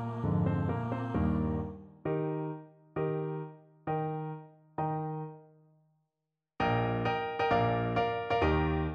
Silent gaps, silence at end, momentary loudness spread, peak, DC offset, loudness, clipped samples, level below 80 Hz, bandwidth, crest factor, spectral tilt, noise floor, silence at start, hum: none; 0 s; 13 LU; -16 dBFS; under 0.1%; -33 LUFS; under 0.1%; -48 dBFS; 6.6 kHz; 18 dB; -9 dB/octave; -88 dBFS; 0 s; none